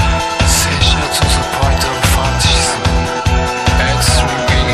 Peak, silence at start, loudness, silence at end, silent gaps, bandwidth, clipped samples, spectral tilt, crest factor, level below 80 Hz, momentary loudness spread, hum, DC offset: 0 dBFS; 0 s; -13 LUFS; 0 s; none; 15 kHz; under 0.1%; -3.5 dB/octave; 12 dB; -18 dBFS; 4 LU; none; under 0.1%